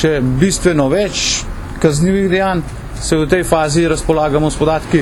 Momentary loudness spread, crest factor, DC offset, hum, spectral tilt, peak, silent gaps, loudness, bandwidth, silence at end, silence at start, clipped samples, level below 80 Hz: 5 LU; 14 dB; under 0.1%; none; -5 dB/octave; 0 dBFS; none; -14 LUFS; 17.5 kHz; 0 s; 0 s; under 0.1%; -28 dBFS